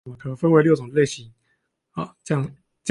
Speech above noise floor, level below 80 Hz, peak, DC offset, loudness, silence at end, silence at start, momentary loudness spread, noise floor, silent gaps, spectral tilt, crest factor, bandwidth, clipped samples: 50 dB; -60 dBFS; -4 dBFS; under 0.1%; -21 LUFS; 0 s; 0.05 s; 17 LU; -71 dBFS; none; -6.5 dB/octave; 18 dB; 11 kHz; under 0.1%